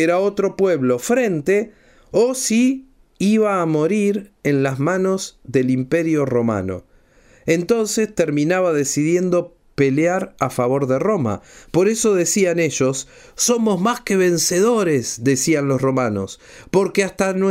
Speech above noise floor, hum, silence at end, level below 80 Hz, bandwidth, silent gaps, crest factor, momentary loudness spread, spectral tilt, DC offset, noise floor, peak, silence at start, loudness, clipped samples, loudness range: 33 dB; none; 0 s; -54 dBFS; 16 kHz; none; 16 dB; 7 LU; -5 dB/octave; under 0.1%; -51 dBFS; -4 dBFS; 0 s; -18 LUFS; under 0.1%; 2 LU